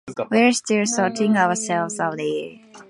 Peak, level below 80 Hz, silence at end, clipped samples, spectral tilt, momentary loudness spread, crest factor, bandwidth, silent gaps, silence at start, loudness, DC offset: -4 dBFS; -68 dBFS; 0.05 s; under 0.1%; -4 dB/octave; 9 LU; 18 dB; 11.5 kHz; none; 0.05 s; -20 LUFS; under 0.1%